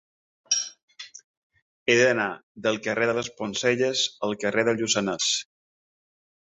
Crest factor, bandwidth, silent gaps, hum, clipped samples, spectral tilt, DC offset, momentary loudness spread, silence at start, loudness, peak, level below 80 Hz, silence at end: 22 dB; 8.4 kHz; 0.82-0.88 s, 1.24-1.50 s, 1.62-1.86 s, 2.43-2.55 s; none; under 0.1%; -2.5 dB/octave; under 0.1%; 12 LU; 0.5 s; -24 LUFS; -4 dBFS; -68 dBFS; 1.05 s